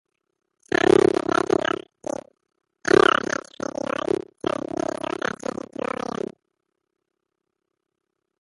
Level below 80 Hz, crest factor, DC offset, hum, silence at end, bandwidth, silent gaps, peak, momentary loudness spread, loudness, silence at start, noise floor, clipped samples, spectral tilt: -56 dBFS; 22 dB; under 0.1%; none; 4.25 s; 11.5 kHz; none; -2 dBFS; 16 LU; -23 LUFS; 0.7 s; -81 dBFS; under 0.1%; -4.5 dB/octave